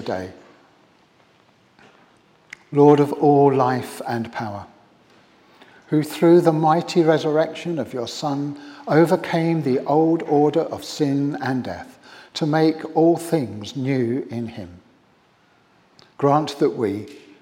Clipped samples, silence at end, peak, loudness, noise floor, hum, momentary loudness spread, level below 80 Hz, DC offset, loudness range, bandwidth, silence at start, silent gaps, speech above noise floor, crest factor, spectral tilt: under 0.1%; 0.25 s; -2 dBFS; -20 LUFS; -58 dBFS; none; 16 LU; -68 dBFS; under 0.1%; 5 LU; 16.5 kHz; 0 s; none; 38 dB; 20 dB; -7 dB/octave